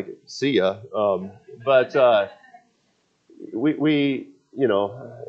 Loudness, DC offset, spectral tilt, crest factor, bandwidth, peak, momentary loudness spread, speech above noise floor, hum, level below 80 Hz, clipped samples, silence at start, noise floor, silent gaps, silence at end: -22 LUFS; under 0.1%; -6 dB/octave; 18 dB; 7.8 kHz; -6 dBFS; 14 LU; 46 dB; none; -74 dBFS; under 0.1%; 0 s; -67 dBFS; none; 0 s